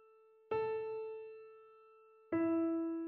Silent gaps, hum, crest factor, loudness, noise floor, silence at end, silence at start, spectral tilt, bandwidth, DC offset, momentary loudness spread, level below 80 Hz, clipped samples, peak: none; none; 14 dB; -38 LUFS; -65 dBFS; 0 s; 0.5 s; -6.5 dB/octave; 4.3 kHz; under 0.1%; 21 LU; -80 dBFS; under 0.1%; -26 dBFS